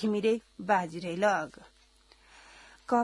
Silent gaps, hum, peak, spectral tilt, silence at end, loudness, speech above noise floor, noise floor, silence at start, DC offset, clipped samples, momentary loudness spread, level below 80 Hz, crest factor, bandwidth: none; none; -12 dBFS; -5.5 dB/octave; 0 s; -30 LUFS; 32 dB; -62 dBFS; 0 s; under 0.1%; under 0.1%; 16 LU; -66 dBFS; 18 dB; 12 kHz